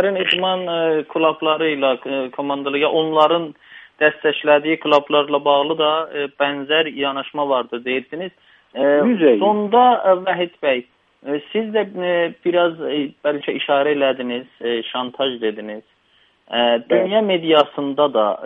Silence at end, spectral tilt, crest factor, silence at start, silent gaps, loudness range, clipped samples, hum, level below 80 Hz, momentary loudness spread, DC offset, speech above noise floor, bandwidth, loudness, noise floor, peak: 0 s; -6.5 dB/octave; 18 dB; 0 s; none; 4 LU; under 0.1%; none; -70 dBFS; 9 LU; under 0.1%; 40 dB; 5.6 kHz; -18 LUFS; -58 dBFS; 0 dBFS